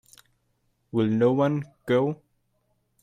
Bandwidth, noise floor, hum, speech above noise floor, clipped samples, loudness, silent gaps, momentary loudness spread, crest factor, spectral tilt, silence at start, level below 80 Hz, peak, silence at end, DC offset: 14 kHz; -72 dBFS; none; 48 dB; under 0.1%; -25 LUFS; none; 10 LU; 16 dB; -8.5 dB/octave; 0.95 s; -64 dBFS; -10 dBFS; 0.85 s; under 0.1%